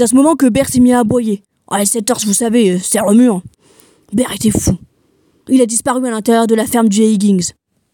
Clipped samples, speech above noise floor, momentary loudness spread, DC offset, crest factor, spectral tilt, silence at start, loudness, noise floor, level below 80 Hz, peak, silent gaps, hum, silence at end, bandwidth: under 0.1%; 44 dB; 9 LU; under 0.1%; 12 dB; -4.5 dB/octave; 0 s; -13 LUFS; -56 dBFS; -42 dBFS; 0 dBFS; none; none; 0.45 s; 17.5 kHz